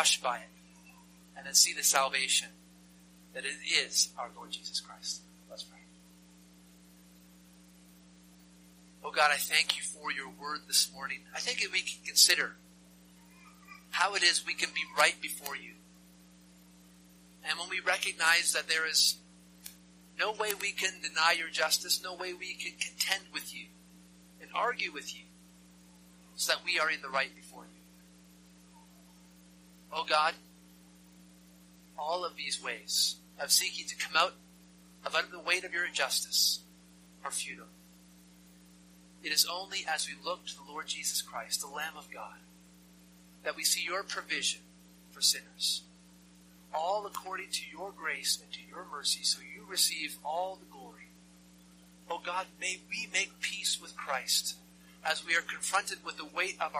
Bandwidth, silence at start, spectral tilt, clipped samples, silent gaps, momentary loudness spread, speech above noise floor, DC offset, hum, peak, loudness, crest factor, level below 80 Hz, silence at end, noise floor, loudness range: 15.5 kHz; 0 s; 0.5 dB/octave; under 0.1%; none; 17 LU; 25 dB; under 0.1%; 60 Hz at -60 dBFS; -6 dBFS; -31 LUFS; 28 dB; -72 dBFS; 0 s; -58 dBFS; 8 LU